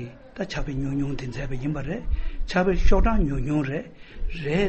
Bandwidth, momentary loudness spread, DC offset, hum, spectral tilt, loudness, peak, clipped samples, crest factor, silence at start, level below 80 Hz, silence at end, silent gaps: 8 kHz; 12 LU; under 0.1%; none; -7 dB/octave; -27 LUFS; -6 dBFS; under 0.1%; 16 dB; 0 s; -26 dBFS; 0 s; none